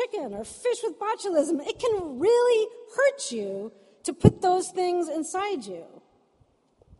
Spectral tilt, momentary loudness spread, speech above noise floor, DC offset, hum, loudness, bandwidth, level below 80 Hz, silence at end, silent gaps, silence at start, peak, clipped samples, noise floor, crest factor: -5.5 dB/octave; 14 LU; 39 dB; under 0.1%; none; -26 LUFS; 11.5 kHz; -54 dBFS; 1.1 s; none; 0 s; -2 dBFS; under 0.1%; -65 dBFS; 24 dB